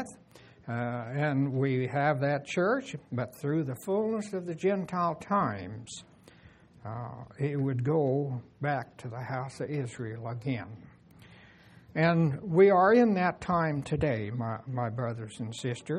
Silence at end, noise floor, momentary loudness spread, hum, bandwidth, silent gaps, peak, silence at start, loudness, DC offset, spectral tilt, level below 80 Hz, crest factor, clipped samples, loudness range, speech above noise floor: 0 s; -56 dBFS; 15 LU; none; 12.5 kHz; none; -10 dBFS; 0 s; -30 LUFS; under 0.1%; -7.5 dB/octave; -62 dBFS; 20 dB; under 0.1%; 8 LU; 27 dB